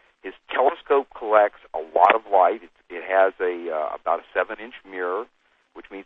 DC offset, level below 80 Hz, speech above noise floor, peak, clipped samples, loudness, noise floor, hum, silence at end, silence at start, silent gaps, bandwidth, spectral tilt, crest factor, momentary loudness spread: under 0.1%; -64 dBFS; 18 dB; 0 dBFS; under 0.1%; -22 LUFS; -41 dBFS; none; 0.05 s; 0.25 s; none; 4.2 kHz; -5.5 dB/octave; 22 dB; 18 LU